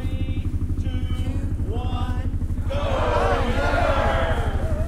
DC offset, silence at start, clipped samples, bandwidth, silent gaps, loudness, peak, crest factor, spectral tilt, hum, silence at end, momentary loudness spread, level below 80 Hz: under 0.1%; 0 s; under 0.1%; 12 kHz; none; -24 LUFS; -8 dBFS; 14 dB; -7 dB/octave; none; 0 s; 6 LU; -26 dBFS